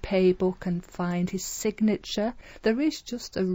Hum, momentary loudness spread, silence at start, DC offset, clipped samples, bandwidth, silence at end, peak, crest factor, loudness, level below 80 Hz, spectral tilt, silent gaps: none; 8 LU; 0.05 s; under 0.1%; under 0.1%; 16 kHz; 0 s; -12 dBFS; 14 dB; -28 LUFS; -48 dBFS; -5.5 dB/octave; none